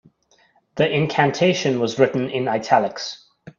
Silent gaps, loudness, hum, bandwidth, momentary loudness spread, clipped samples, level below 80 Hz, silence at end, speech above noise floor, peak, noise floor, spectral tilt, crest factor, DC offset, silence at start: none; -20 LUFS; none; 7.6 kHz; 13 LU; under 0.1%; -62 dBFS; 0.1 s; 40 dB; 0 dBFS; -59 dBFS; -5.5 dB/octave; 20 dB; under 0.1%; 0.75 s